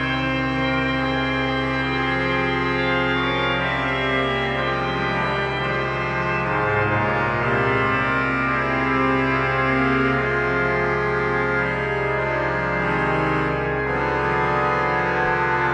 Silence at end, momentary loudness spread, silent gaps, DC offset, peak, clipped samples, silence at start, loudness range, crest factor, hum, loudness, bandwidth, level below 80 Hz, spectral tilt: 0 s; 3 LU; none; under 0.1%; -8 dBFS; under 0.1%; 0 s; 2 LU; 14 dB; none; -21 LUFS; 9.6 kHz; -38 dBFS; -6.5 dB/octave